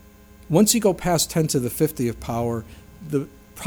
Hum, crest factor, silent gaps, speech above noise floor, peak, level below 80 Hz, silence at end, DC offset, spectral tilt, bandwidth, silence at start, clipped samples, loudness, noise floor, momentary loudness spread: none; 20 dB; none; 26 dB; -2 dBFS; -46 dBFS; 0 s; under 0.1%; -4.5 dB/octave; over 20 kHz; 0.5 s; under 0.1%; -22 LUFS; -47 dBFS; 11 LU